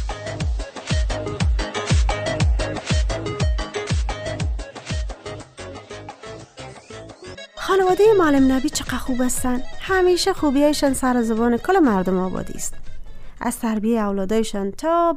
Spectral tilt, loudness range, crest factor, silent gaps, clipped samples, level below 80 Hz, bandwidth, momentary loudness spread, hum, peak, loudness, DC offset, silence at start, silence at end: -5.5 dB/octave; 10 LU; 16 dB; none; under 0.1%; -28 dBFS; 15.5 kHz; 19 LU; none; -6 dBFS; -21 LUFS; under 0.1%; 0 s; 0 s